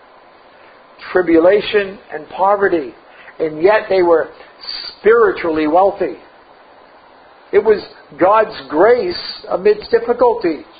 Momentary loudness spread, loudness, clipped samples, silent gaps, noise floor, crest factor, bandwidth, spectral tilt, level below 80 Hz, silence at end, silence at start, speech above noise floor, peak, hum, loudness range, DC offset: 14 LU; -15 LUFS; under 0.1%; none; -44 dBFS; 16 dB; 5 kHz; -10 dB/octave; -50 dBFS; 0.15 s; 1 s; 30 dB; 0 dBFS; none; 2 LU; under 0.1%